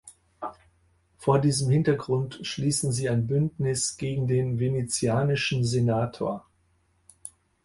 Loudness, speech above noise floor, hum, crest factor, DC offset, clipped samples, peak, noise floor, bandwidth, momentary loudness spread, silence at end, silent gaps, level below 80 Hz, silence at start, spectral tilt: -26 LUFS; 42 dB; none; 20 dB; under 0.1%; under 0.1%; -8 dBFS; -67 dBFS; 11.5 kHz; 16 LU; 0.35 s; none; -54 dBFS; 0.05 s; -5.5 dB/octave